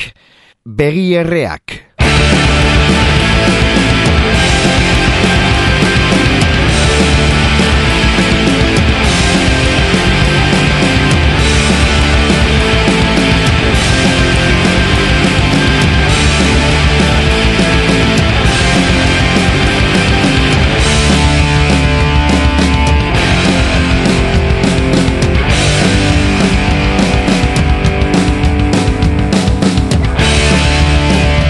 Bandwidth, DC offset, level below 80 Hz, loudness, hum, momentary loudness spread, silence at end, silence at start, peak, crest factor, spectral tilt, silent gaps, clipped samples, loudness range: 12 kHz; under 0.1%; -16 dBFS; -10 LUFS; none; 2 LU; 0 s; 0 s; 0 dBFS; 10 dB; -5 dB/octave; none; under 0.1%; 1 LU